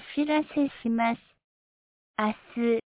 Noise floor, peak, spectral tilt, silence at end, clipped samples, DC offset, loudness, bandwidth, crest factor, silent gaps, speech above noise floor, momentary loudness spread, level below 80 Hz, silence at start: under -90 dBFS; -12 dBFS; -4 dB/octave; 0.2 s; under 0.1%; under 0.1%; -28 LUFS; 4 kHz; 16 dB; 1.44-2.14 s; over 63 dB; 5 LU; -66 dBFS; 0 s